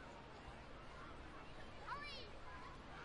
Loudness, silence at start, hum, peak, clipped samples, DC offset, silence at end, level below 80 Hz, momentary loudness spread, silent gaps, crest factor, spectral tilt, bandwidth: -54 LUFS; 0 s; none; -36 dBFS; under 0.1%; under 0.1%; 0 s; -62 dBFS; 7 LU; none; 18 dB; -4.5 dB/octave; 11 kHz